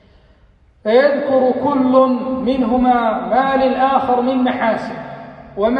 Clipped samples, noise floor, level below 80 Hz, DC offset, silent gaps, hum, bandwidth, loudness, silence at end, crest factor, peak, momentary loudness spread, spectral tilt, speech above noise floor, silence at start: under 0.1%; -51 dBFS; -46 dBFS; under 0.1%; none; none; 5.6 kHz; -15 LUFS; 0 s; 14 dB; -2 dBFS; 13 LU; -7.5 dB/octave; 36 dB; 0.85 s